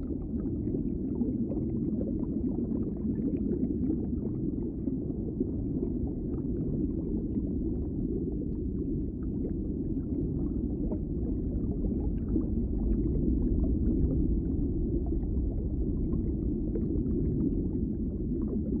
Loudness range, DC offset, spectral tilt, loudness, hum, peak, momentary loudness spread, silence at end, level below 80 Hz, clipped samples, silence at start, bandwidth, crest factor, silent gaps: 3 LU; under 0.1%; -16 dB/octave; -32 LUFS; none; -14 dBFS; 4 LU; 0 s; -36 dBFS; under 0.1%; 0 s; 1.8 kHz; 16 dB; none